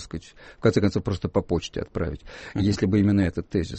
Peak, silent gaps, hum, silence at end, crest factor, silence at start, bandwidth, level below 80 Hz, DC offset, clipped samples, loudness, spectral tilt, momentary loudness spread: -8 dBFS; none; none; 0 s; 16 dB; 0 s; 8.4 kHz; -42 dBFS; under 0.1%; under 0.1%; -25 LUFS; -7 dB/octave; 12 LU